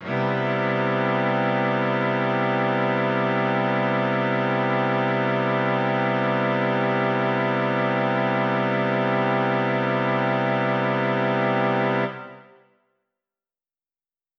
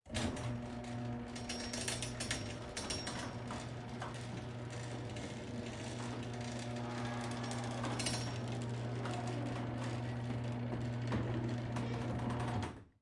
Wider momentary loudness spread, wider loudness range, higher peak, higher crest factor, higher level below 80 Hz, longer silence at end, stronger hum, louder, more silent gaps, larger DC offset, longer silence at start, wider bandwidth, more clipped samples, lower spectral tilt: second, 1 LU vs 6 LU; about the same, 2 LU vs 4 LU; first, -10 dBFS vs -20 dBFS; second, 14 dB vs 20 dB; second, -84 dBFS vs -58 dBFS; first, 2 s vs 0.15 s; neither; first, -22 LUFS vs -41 LUFS; neither; neither; about the same, 0 s vs 0.05 s; second, 6.6 kHz vs 11.5 kHz; neither; about the same, -5 dB/octave vs -5 dB/octave